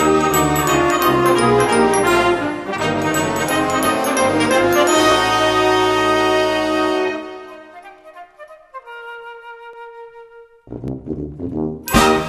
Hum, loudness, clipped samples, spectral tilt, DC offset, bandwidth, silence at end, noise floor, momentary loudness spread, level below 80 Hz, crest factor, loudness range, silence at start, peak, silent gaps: none; -16 LUFS; under 0.1%; -4 dB/octave; under 0.1%; 14 kHz; 0 s; -42 dBFS; 21 LU; -40 dBFS; 16 dB; 19 LU; 0 s; 0 dBFS; none